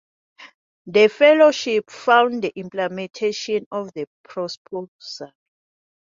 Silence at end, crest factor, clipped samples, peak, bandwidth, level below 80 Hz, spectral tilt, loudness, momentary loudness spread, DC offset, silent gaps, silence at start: 0.8 s; 18 dB; under 0.1%; -2 dBFS; 7.6 kHz; -72 dBFS; -4 dB/octave; -19 LUFS; 20 LU; under 0.1%; 0.54-0.85 s, 3.66-3.71 s, 4.07-4.24 s, 4.57-4.65 s, 4.88-4.99 s; 0.4 s